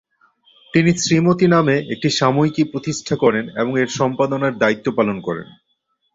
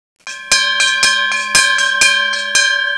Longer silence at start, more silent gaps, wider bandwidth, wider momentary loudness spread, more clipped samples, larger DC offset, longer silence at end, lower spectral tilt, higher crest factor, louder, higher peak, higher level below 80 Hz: first, 0.75 s vs 0.25 s; neither; second, 7.8 kHz vs 11 kHz; first, 7 LU vs 4 LU; neither; neither; first, 0.7 s vs 0 s; first, -5.5 dB/octave vs 2.5 dB/octave; about the same, 16 dB vs 14 dB; second, -18 LUFS vs -11 LUFS; about the same, -2 dBFS vs 0 dBFS; about the same, -54 dBFS vs -52 dBFS